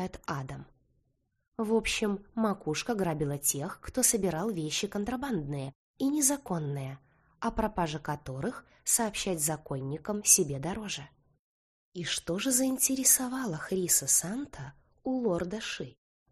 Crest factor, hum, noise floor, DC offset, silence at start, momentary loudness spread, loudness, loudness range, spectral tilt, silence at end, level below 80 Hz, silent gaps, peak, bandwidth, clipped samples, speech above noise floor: 24 dB; none; -75 dBFS; under 0.1%; 0 s; 15 LU; -30 LUFS; 5 LU; -3 dB/octave; 0.4 s; -54 dBFS; 1.48-1.52 s, 5.75-5.94 s, 11.39-11.92 s; -6 dBFS; 13 kHz; under 0.1%; 45 dB